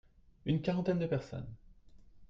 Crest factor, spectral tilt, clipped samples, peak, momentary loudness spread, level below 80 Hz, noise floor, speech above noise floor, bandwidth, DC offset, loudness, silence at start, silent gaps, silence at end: 18 dB; -8.5 dB/octave; under 0.1%; -20 dBFS; 13 LU; -60 dBFS; -57 dBFS; 23 dB; 7.4 kHz; under 0.1%; -36 LUFS; 0.45 s; none; 0.05 s